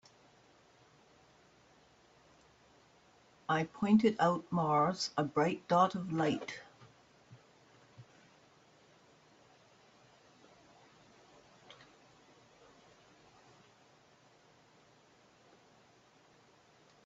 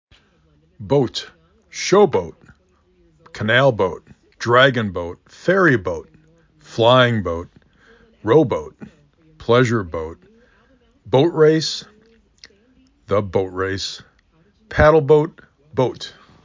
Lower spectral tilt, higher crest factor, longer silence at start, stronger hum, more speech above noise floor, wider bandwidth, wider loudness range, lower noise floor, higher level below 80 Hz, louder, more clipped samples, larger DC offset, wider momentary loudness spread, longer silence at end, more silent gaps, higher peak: about the same, -5 dB/octave vs -5.5 dB/octave; about the same, 22 dB vs 18 dB; first, 3.5 s vs 0.8 s; neither; second, 34 dB vs 41 dB; about the same, 8 kHz vs 7.6 kHz; first, 12 LU vs 4 LU; first, -65 dBFS vs -58 dBFS; second, -76 dBFS vs -42 dBFS; second, -32 LUFS vs -18 LUFS; neither; neither; first, 29 LU vs 18 LU; first, 9.05 s vs 0.35 s; neither; second, -16 dBFS vs -2 dBFS